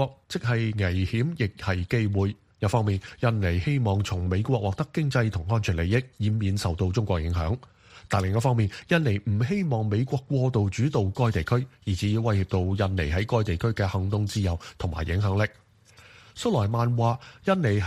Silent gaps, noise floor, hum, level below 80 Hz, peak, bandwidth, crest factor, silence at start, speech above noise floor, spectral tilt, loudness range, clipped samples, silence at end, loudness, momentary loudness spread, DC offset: none; -54 dBFS; none; -42 dBFS; -6 dBFS; 12.5 kHz; 18 dB; 0 s; 29 dB; -7 dB/octave; 2 LU; under 0.1%; 0 s; -26 LUFS; 5 LU; under 0.1%